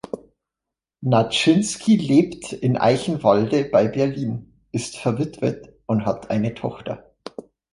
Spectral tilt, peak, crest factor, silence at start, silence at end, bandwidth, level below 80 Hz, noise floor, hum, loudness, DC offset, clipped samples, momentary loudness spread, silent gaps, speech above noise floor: -6 dB/octave; -2 dBFS; 18 dB; 0.15 s; 0.3 s; 11.5 kHz; -56 dBFS; -86 dBFS; none; -21 LUFS; under 0.1%; under 0.1%; 17 LU; none; 66 dB